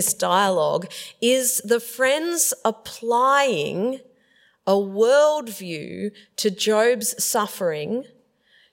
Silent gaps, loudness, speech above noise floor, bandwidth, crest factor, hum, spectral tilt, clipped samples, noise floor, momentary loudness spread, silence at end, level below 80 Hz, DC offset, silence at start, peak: none; -21 LUFS; 39 dB; 16.5 kHz; 16 dB; none; -2.5 dB/octave; under 0.1%; -60 dBFS; 13 LU; 0.7 s; -70 dBFS; under 0.1%; 0 s; -6 dBFS